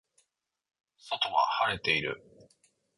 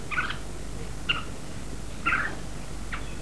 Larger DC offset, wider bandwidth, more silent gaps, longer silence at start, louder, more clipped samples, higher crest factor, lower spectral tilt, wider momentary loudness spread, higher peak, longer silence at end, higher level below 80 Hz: second, under 0.1% vs 2%; about the same, 11.5 kHz vs 11 kHz; neither; first, 1.05 s vs 0 s; first, -29 LUFS vs -32 LUFS; neither; about the same, 22 dB vs 20 dB; about the same, -3.5 dB/octave vs -3.5 dB/octave; about the same, 11 LU vs 12 LU; about the same, -12 dBFS vs -12 dBFS; first, 0.8 s vs 0 s; second, -64 dBFS vs -40 dBFS